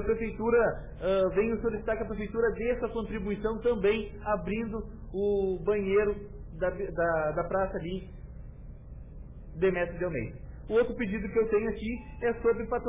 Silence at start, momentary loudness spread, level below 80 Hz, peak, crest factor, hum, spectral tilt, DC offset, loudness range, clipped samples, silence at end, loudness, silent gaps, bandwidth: 0 s; 19 LU; -44 dBFS; -16 dBFS; 14 dB; none; -10.5 dB/octave; under 0.1%; 4 LU; under 0.1%; 0 s; -30 LUFS; none; 3.8 kHz